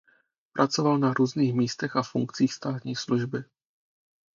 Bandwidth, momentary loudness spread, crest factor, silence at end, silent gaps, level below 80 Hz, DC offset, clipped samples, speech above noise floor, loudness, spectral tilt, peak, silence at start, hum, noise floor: 7.4 kHz; 9 LU; 20 dB; 0.9 s; none; -70 dBFS; under 0.1%; under 0.1%; 41 dB; -27 LUFS; -6 dB/octave; -6 dBFS; 0.55 s; none; -67 dBFS